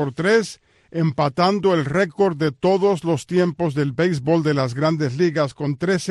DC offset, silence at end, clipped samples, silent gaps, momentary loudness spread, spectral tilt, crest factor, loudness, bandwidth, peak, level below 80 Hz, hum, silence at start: under 0.1%; 0 s; under 0.1%; none; 4 LU; -6.5 dB/octave; 14 dB; -20 LUFS; 12 kHz; -6 dBFS; -56 dBFS; none; 0 s